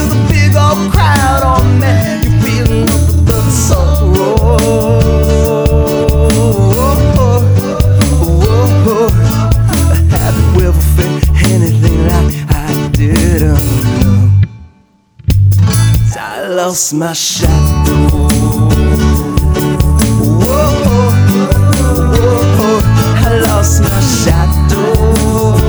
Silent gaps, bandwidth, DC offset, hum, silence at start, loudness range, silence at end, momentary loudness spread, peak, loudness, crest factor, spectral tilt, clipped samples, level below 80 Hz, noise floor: none; over 20 kHz; under 0.1%; none; 0 s; 2 LU; 0 s; 3 LU; 0 dBFS; -10 LUFS; 8 dB; -6 dB/octave; under 0.1%; -14 dBFS; -47 dBFS